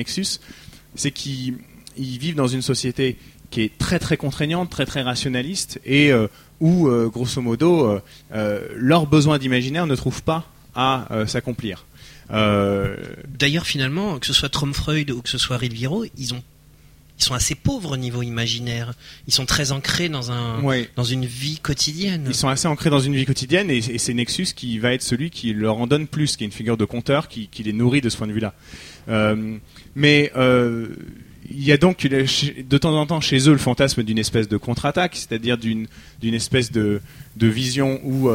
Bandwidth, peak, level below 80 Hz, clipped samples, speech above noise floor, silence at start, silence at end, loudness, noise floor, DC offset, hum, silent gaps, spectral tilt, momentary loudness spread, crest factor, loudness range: 16.5 kHz; -2 dBFS; -44 dBFS; under 0.1%; 29 dB; 0 s; 0 s; -20 LUFS; -49 dBFS; under 0.1%; none; none; -4.5 dB/octave; 12 LU; 20 dB; 4 LU